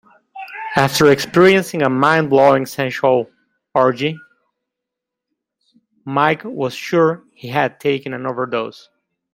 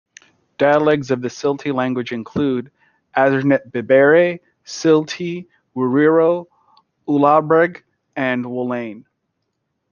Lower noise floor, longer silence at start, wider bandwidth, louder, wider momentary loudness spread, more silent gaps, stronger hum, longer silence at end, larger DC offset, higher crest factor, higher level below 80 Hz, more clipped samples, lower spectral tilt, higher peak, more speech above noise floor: first, -82 dBFS vs -73 dBFS; second, 0.35 s vs 0.6 s; first, 16 kHz vs 7.2 kHz; about the same, -16 LUFS vs -17 LUFS; first, 17 LU vs 13 LU; neither; neither; second, 0.6 s vs 0.9 s; neither; about the same, 18 dB vs 16 dB; about the same, -58 dBFS vs -62 dBFS; neither; about the same, -5.5 dB/octave vs -6.5 dB/octave; about the same, 0 dBFS vs -2 dBFS; first, 66 dB vs 57 dB